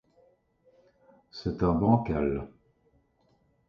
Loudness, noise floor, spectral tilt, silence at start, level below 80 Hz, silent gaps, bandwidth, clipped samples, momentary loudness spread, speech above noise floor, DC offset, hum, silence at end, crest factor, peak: -28 LUFS; -69 dBFS; -9.5 dB/octave; 1.35 s; -48 dBFS; none; 6.6 kHz; under 0.1%; 18 LU; 42 dB; under 0.1%; none; 1.2 s; 22 dB; -10 dBFS